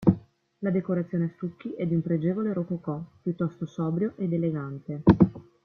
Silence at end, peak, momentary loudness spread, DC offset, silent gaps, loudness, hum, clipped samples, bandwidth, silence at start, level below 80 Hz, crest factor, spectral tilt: 0.25 s; -4 dBFS; 12 LU; under 0.1%; none; -28 LUFS; none; under 0.1%; 4.6 kHz; 0 s; -52 dBFS; 24 dB; -11 dB/octave